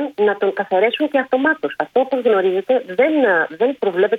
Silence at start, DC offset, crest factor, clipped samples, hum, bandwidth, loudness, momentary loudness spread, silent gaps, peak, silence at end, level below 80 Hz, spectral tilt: 0 s; under 0.1%; 14 dB; under 0.1%; none; 5 kHz; -17 LUFS; 4 LU; none; -2 dBFS; 0 s; -68 dBFS; -6.5 dB/octave